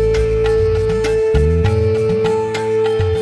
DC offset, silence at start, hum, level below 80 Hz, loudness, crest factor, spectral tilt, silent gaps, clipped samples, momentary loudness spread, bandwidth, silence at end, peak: under 0.1%; 0 s; none; -24 dBFS; -16 LUFS; 12 dB; -7 dB/octave; none; under 0.1%; 2 LU; 11 kHz; 0 s; -2 dBFS